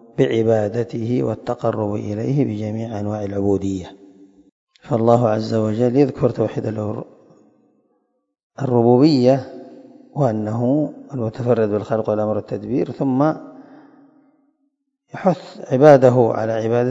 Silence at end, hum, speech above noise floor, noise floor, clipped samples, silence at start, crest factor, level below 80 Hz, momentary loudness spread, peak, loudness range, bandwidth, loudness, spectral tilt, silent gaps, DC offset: 0 s; none; 53 dB; -70 dBFS; under 0.1%; 0.2 s; 20 dB; -58 dBFS; 13 LU; 0 dBFS; 5 LU; 7.8 kHz; -19 LUFS; -8.5 dB/octave; 4.52-4.67 s, 8.43-8.50 s; under 0.1%